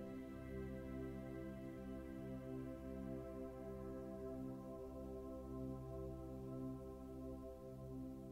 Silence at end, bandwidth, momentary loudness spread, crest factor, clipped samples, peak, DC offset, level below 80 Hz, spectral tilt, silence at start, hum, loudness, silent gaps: 0 s; 16 kHz; 3 LU; 12 dB; under 0.1%; -38 dBFS; under 0.1%; -60 dBFS; -8.5 dB/octave; 0 s; none; -51 LUFS; none